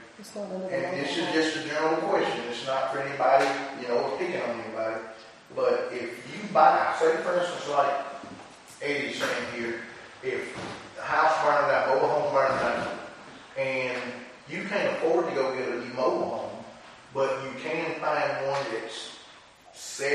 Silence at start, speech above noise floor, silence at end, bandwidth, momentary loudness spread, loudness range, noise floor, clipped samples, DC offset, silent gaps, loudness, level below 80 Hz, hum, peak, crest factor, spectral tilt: 0 s; 25 dB; 0 s; 11.5 kHz; 16 LU; 5 LU; -52 dBFS; under 0.1%; under 0.1%; none; -27 LUFS; -68 dBFS; none; -6 dBFS; 22 dB; -4 dB/octave